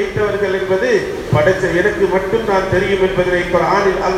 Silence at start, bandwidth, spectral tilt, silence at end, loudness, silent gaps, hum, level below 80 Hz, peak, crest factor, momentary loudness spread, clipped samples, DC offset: 0 s; 14.5 kHz; -6 dB/octave; 0 s; -15 LUFS; none; none; -36 dBFS; 0 dBFS; 14 dB; 3 LU; under 0.1%; under 0.1%